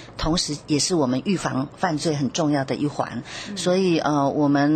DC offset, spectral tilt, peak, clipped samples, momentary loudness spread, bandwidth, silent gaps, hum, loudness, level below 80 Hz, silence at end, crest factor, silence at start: under 0.1%; -5 dB/octave; -6 dBFS; under 0.1%; 7 LU; 12.5 kHz; none; none; -23 LUFS; -44 dBFS; 0 s; 16 dB; 0 s